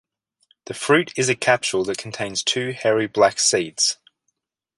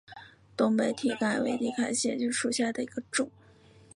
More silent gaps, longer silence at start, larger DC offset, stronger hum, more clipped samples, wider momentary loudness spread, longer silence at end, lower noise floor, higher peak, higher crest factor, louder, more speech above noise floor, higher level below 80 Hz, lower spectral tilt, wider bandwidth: neither; first, 0.7 s vs 0.1 s; neither; neither; neither; about the same, 10 LU vs 10 LU; first, 0.85 s vs 0.65 s; first, -75 dBFS vs -57 dBFS; first, 0 dBFS vs -12 dBFS; about the same, 22 dB vs 18 dB; first, -20 LUFS vs -29 LUFS; first, 54 dB vs 28 dB; first, -62 dBFS vs -70 dBFS; about the same, -2.5 dB/octave vs -3.5 dB/octave; about the same, 11.5 kHz vs 11.5 kHz